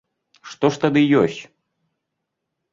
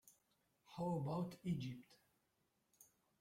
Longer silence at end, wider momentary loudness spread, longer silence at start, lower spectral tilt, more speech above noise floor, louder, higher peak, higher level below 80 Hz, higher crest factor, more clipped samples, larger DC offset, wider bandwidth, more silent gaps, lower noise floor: first, 1.3 s vs 0.35 s; first, 19 LU vs 13 LU; first, 0.45 s vs 0.05 s; about the same, -6.5 dB/octave vs -7.5 dB/octave; first, 61 dB vs 40 dB; first, -18 LUFS vs -45 LUFS; first, -4 dBFS vs -32 dBFS; first, -60 dBFS vs -78 dBFS; about the same, 18 dB vs 16 dB; neither; neither; second, 7.6 kHz vs 16 kHz; neither; second, -79 dBFS vs -84 dBFS